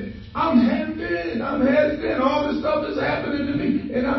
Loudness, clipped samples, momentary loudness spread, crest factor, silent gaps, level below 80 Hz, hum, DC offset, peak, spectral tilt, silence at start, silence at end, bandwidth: -22 LUFS; under 0.1%; 7 LU; 16 dB; none; -44 dBFS; none; under 0.1%; -4 dBFS; -7.5 dB/octave; 0 s; 0 s; 6 kHz